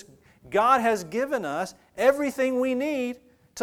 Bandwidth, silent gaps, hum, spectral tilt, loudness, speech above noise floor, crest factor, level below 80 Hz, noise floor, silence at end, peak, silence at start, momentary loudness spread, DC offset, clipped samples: 17 kHz; none; none; -4.5 dB/octave; -25 LUFS; 28 dB; 20 dB; -64 dBFS; -52 dBFS; 0 s; -6 dBFS; 0.45 s; 13 LU; under 0.1%; under 0.1%